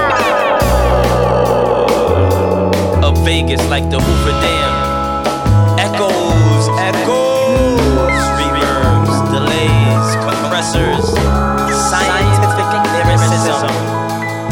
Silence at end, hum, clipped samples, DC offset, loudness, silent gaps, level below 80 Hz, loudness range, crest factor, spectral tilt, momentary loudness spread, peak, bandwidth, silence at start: 0 s; none; under 0.1%; under 0.1%; -13 LUFS; none; -22 dBFS; 1 LU; 12 dB; -5.5 dB/octave; 3 LU; 0 dBFS; 17.5 kHz; 0 s